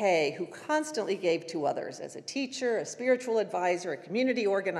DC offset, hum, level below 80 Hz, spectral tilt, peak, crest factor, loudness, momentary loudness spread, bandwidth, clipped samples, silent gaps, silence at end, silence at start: under 0.1%; none; under -90 dBFS; -4 dB/octave; -14 dBFS; 16 dB; -30 LUFS; 9 LU; 12.5 kHz; under 0.1%; none; 0 s; 0 s